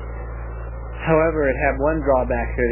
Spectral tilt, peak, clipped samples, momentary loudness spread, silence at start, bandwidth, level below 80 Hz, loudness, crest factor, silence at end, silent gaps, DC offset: -11.5 dB/octave; -4 dBFS; under 0.1%; 14 LU; 0 s; 3.1 kHz; -28 dBFS; -20 LUFS; 18 dB; 0 s; none; under 0.1%